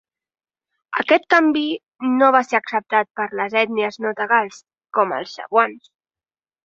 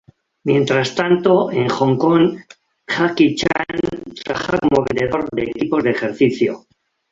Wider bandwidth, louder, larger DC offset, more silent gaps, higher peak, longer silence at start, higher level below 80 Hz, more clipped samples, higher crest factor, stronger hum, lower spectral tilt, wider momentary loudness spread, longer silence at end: about the same, 7.8 kHz vs 7.8 kHz; about the same, -19 LUFS vs -17 LUFS; neither; neither; about the same, -2 dBFS vs -2 dBFS; first, 0.9 s vs 0.45 s; second, -70 dBFS vs -50 dBFS; neither; about the same, 20 dB vs 16 dB; neither; second, -4.5 dB/octave vs -6 dB/octave; about the same, 10 LU vs 9 LU; first, 0.85 s vs 0.55 s